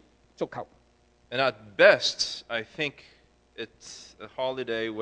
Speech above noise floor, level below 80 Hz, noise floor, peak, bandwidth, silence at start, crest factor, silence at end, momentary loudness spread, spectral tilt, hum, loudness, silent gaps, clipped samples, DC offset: 36 dB; -66 dBFS; -63 dBFS; -2 dBFS; 9.6 kHz; 0.4 s; 26 dB; 0 s; 23 LU; -2.5 dB/octave; none; -26 LUFS; none; under 0.1%; under 0.1%